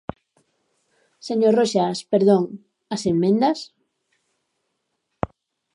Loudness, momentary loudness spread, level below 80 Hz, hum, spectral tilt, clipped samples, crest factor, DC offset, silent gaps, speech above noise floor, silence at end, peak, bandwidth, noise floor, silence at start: -21 LUFS; 19 LU; -54 dBFS; none; -6 dB/octave; under 0.1%; 20 dB; under 0.1%; none; 56 dB; 0.5 s; -2 dBFS; 11 kHz; -75 dBFS; 1.25 s